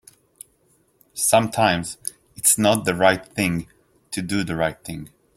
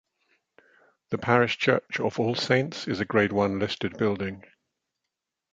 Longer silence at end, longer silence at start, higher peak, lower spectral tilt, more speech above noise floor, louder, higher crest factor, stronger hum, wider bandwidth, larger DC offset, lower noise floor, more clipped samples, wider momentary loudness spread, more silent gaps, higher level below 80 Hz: second, 0.3 s vs 1.15 s; about the same, 1.15 s vs 1.1 s; about the same, -2 dBFS vs -4 dBFS; second, -3.5 dB/octave vs -6 dB/octave; second, 41 dB vs 59 dB; first, -20 LUFS vs -26 LUFS; about the same, 20 dB vs 24 dB; neither; first, 16.5 kHz vs 8.6 kHz; neither; second, -62 dBFS vs -85 dBFS; neither; first, 16 LU vs 9 LU; neither; about the same, -54 dBFS vs -58 dBFS